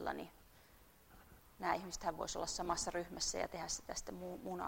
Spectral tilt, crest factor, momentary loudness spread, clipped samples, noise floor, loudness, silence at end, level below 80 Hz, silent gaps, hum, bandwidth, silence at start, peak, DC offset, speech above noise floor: -2.5 dB/octave; 22 dB; 9 LU; under 0.1%; -65 dBFS; -42 LUFS; 0 s; -60 dBFS; none; none; 16 kHz; 0 s; -22 dBFS; under 0.1%; 23 dB